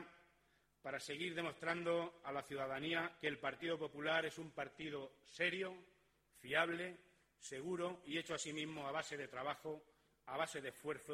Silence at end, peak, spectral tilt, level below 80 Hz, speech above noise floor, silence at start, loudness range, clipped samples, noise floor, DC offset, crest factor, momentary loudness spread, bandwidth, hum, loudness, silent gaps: 0 s; -22 dBFS; -3.5 dB/octave; -80 dBFS; 34 dB; 0 s; 3 LU; under 0.1%; -78 dBFS; under 0.1%; 22 dB; 12 LU; 16 kHz; none; -44 LUFS; none